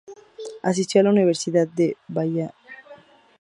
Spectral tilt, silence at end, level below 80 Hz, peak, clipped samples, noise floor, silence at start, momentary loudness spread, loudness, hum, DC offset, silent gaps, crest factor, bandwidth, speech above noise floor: -6 dB/octave; 0.45 s; -70 dBFS; -4 dBFS; under 0.1%; -48 dBFS; 0.1 s; 20 LU; -21 LUFS; none; under 0.1%; none; 20 dB; 11 kHz; 28 dB